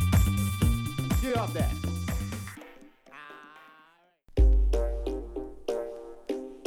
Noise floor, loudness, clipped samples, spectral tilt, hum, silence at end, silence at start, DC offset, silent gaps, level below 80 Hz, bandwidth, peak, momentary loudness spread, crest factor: -61 dBFS; -30 LUFS; under 0.1%; -6 dB/octave; none; 0 s; 0 s; under 0.1%; none; -30 dBFS; 16.5 kHz; -12 dBFS; 22 LU; 18 dB